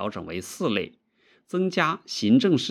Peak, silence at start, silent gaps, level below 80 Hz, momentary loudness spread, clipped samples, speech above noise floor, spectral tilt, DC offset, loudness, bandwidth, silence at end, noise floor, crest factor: -6 dBFS; 0 s; none; -70 dBFS; 14 LU; under 0.1%; 39 dB; -5 dB/octave; under 0.1%; -25 LUFS; 14 kHz; 0 s; -63 dBFS; 20 dB